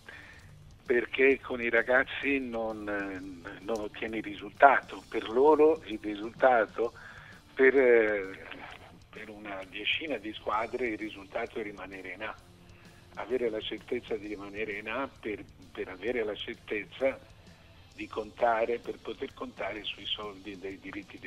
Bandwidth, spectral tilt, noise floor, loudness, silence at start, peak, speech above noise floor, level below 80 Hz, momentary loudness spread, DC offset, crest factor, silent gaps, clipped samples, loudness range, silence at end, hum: 12.5 kHz; -5 dB/octave; -55 dBFS; -30 LUFS; 0.1 s; -6 dBFS; 24 dB; -60 dBFS; 19 LU; under 0.1%; 26 dB; none; under 0.1%; 10 LU; 0 s; none